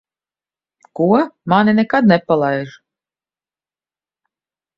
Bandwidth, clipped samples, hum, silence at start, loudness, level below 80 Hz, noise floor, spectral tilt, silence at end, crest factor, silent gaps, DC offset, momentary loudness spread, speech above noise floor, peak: 6 kHz; under 0.1%; none; 0.95 s; -15 LUFS; -60 dBFS; under -90 dBFS; -8.5 dB/octave; 2.1 s; 18 dB; none; under 0.1%; 11 LU; over 76 dB; 0 dBFS